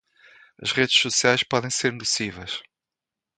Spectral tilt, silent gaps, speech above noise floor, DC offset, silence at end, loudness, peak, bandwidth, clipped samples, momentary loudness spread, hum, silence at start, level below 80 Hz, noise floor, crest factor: -2 dB/octave; none; 64 dB; under 0.1%; 0.75 s; -22 LUFS; -4 dBFS; 9.6 kHz; under 0.1%; 14 LU; none; 0.6 s; -60 dBFS; -88 dBFS; 22 dB